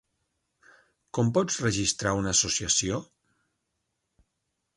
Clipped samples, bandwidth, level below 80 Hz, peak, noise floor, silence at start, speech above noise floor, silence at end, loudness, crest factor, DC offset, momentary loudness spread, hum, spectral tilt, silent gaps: under 0.1%; 11.5 kHz; -52 dBFS; -10 dBFS; -80 dBFS; 1.15 s; 54 dB; 1.7 s; -26 LUFS; 20 dB; under 0.1%; 8 LU; none; -3 dB/octave; none